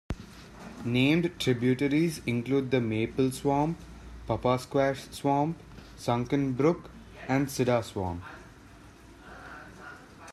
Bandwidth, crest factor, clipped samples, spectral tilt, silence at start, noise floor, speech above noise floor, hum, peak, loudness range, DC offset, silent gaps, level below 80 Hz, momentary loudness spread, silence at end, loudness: 14 kHz; 18 dB; under 0.1%; -6.5 dB/octave; 0.1 s; -51 dBFS; 24 dB; none; -12 dBFS; 4 LU; under 0.1%; none; -52 dBFS; 21 LU; 0 s; -28 LUFS